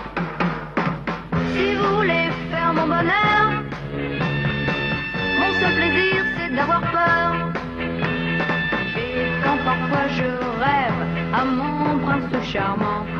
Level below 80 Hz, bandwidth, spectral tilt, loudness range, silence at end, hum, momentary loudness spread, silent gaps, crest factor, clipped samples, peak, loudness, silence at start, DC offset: -42 dBFS; 7.2 kHz; -7 dB/octave; 2 LU; 0 s; none; 7 LU; none; 16 dB; under 0.1%; -6 dBFS; -21 LUFS; 0 s; under 0.1%